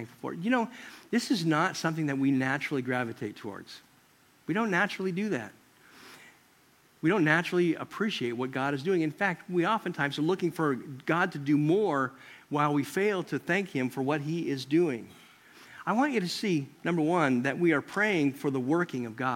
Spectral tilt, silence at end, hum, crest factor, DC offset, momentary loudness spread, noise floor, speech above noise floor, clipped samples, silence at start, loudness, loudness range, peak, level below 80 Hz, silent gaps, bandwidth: -6 dB/octave; 0 s; none; 20 dB; under 0.1%; 10 LU; -62 dBFS; 34 dB; under 0.1%; 0 s; -29 LUFS; 4 LU; -8 dBFS; -76 dBFS; none; 16.5 kHz